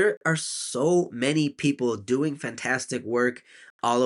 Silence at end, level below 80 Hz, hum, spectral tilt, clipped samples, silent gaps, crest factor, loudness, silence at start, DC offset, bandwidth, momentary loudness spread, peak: 0 s; -70 dBFS; none; -4.5 dB/octave; under 0.1%; 0.17-0.21 s, 3.70-3.79 s; 16 dB; -26 LUFS; 0 s; under 0.1%; 11.5 kHz; 6 LU; -10 dBFS